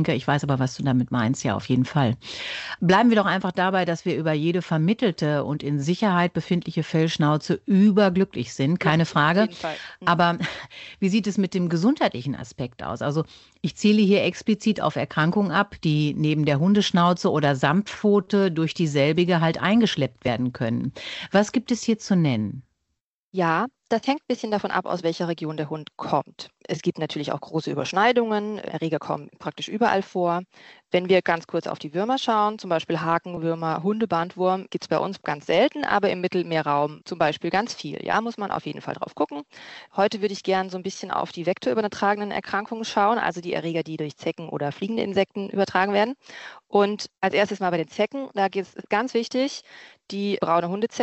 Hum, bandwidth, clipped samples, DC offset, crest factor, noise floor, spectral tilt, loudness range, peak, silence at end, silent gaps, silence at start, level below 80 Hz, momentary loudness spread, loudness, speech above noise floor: none; 8.2 kHz; under 0.1%; under 0.1%; 18 dB; -79 dBFS; -6 dB/octave; 5 LU; -4 dBFS; 0 s; 23.02-23.32 s; 0 s; -60 dBFS; 11 LU; -24 LUFS; 56 dB